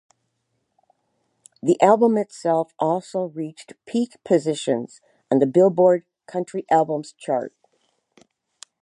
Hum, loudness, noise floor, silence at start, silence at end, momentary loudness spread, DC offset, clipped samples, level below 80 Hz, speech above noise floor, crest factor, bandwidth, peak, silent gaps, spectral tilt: none; -21 LUFS; -74 dBFS; 1.65 s; 1.35 s; 14 LU; under 0.1%; under 0.1%; -76 dBFS; 53 dB; 20 dB; 11 kHz; -2 dBFS; none; -6.5 dB/octave